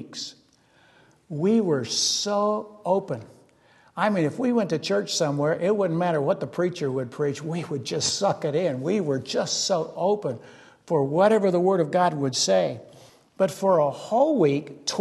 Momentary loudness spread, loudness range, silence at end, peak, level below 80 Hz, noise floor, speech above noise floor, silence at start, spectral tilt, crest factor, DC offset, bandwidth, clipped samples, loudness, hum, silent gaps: 9 LU; 3 LU; 0 s; -6 dBFS; -70 dBFS; -59 dBFS; 36 dB; 0 s; -4.5 dB/octave; 18 dB; under 0.1%; 12.5 kHz; under 0.1%; -24 LUFS; none; none